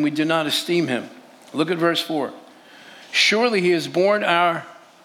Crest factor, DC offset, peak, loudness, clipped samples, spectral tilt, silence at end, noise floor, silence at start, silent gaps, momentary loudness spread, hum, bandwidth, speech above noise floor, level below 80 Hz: 18 dB; under 0.1%; -4 dBFS; -20 LUFS; under 0.1%; -4 dB/octave; 0.3 s; -45 dBFS; 0 s; none; 11 LU; none; 16.5 kHz; 26 dB; -86 dBFS